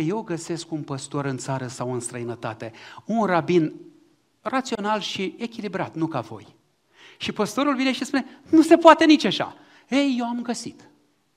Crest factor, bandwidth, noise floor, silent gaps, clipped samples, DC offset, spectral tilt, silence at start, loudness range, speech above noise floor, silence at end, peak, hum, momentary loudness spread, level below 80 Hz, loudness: 22 dB; 13 kHz; -59 dBFS; none; under 0.1%; under 0.1%; -5 dB/octave; 0 s; 10 LU; 37 dB; 0.65 s; 0 dBFS; none; 16 LU; -66 dBFS; -23 LUFS